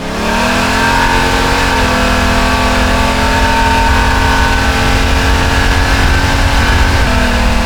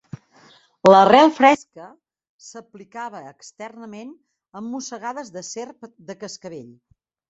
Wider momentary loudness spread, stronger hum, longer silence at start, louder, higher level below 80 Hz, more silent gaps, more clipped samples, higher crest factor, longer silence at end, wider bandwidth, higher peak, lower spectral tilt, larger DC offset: second, 1 LU vs 28 LU; neither; second, 0 s vs 0.85 s; first, -11 LUFS vs -16 LUFS; first, -14 dBFS vs -64 dBFS; second, none vs 2.29-2.39 s; neither; second, 10 dB vs 20 dB; second, 0 s vs 0.7 s; first, over 20 kHz vs 8 kHz; about the same, 0 dBFS vs -2 dBFS; about the same, -4.5 dB/octave vs -4.5 dB/octave; neither